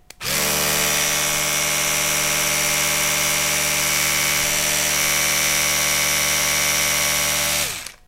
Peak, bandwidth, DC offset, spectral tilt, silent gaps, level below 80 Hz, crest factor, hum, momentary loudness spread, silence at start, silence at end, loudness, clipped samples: -4 dBFS; 16 kHz; under 0.1%; 0 dB/octave; none; -44 dBFS; 16 dB; none; 2 LU; 0.2 s; 0.15 s; -17 LUFS; under 0.1%